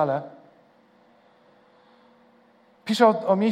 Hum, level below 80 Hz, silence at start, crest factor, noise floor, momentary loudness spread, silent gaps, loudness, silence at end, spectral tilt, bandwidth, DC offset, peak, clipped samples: none; -82 dBFS; 0 s; 22 dB; -58 dBFS; 22 LU; none; -22 LUFS; 0 s; -6 dB/octave; 14.5 kHz; under 0.1%; -4 dBFS; under 0.1%